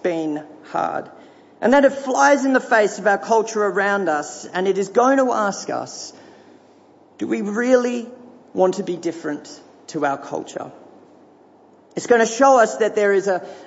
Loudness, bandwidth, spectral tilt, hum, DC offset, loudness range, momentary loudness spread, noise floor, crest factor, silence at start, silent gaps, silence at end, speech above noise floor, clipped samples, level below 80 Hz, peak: -19 LUFS; 8 kHz; -4 dB/octave; none; under 0.1%; 8 LU; 17 LU; -50 dBFS; 16 dB; 0.05 s; none; 0 s; 32 dB; under 0.1%; -68 dBFS; -4 dBFS